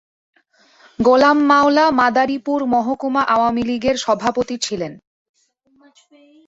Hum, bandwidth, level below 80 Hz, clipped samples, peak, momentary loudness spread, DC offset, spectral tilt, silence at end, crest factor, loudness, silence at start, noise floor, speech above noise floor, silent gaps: none; 8 kHz; -54 dBFS; under 0.1%; -2 dBFS; 10 LU; under 0.1%; -4 dB/octave; 1.5 s; 16 dB; -16 LUFS; 1 s; -58 dBFS; 42 dB; none